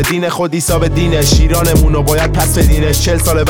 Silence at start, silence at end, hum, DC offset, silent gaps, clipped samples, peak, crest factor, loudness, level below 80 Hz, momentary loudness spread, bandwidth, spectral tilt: 0 s; 0 s; none; under 0.1%; none; under 0.1%; 0 dBFS; 10 dB; -12 LUFS; -16 dBFS; 4 LU; 19.5 kHz; -5 dB/octave